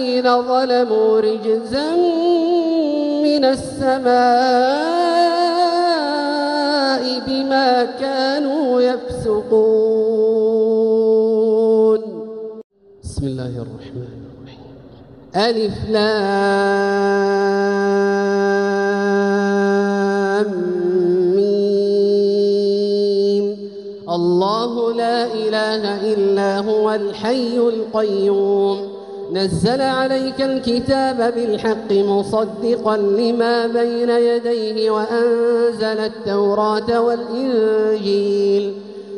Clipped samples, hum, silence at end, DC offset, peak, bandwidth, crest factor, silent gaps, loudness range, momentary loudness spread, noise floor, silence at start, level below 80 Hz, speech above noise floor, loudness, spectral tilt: under 0.1%; none; 0 s; under 0.1%; -2 dBFS; 11 kHz; 14 dB; 12.64-12.70 s; 3 LU; 6 LU; -41 dBFS; 0 s; -50 dBFS; 24 dB; -17 LUFS; -6 dB/octave